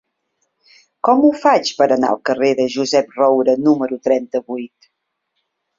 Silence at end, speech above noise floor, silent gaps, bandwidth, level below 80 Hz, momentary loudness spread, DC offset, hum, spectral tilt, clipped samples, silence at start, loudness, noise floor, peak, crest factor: 1.15 s; 57 dB; none; 7.8 kHz; -62 dBFS; 10 LU; under 0.1%; none; -4.5 dB/octave; under 0.1%; 1.05 s; -16 LUFS; -72 dBFS; -2 dBFS; 16 dB